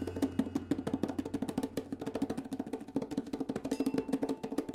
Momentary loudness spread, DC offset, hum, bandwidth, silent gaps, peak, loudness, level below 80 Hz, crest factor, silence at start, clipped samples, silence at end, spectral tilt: 5 LU; under 0.1%; none; 15.5 kHz; none; -18 dBFS; -37 LUFS; -62 dBFS; 18 dB; 0 s; under 0.1%; 0 s; -6.5 dB/octave